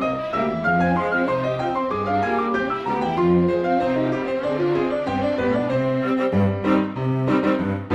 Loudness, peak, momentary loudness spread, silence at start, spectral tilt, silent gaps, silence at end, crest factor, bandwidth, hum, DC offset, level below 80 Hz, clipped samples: -21 LUFS; -6 dBFS; 4 LU; 0 s; -8 dB/octave; none; 0 s; 14 dB; 9.2 kHz; none; under 0.1%; -50 dBFS; under 0.1%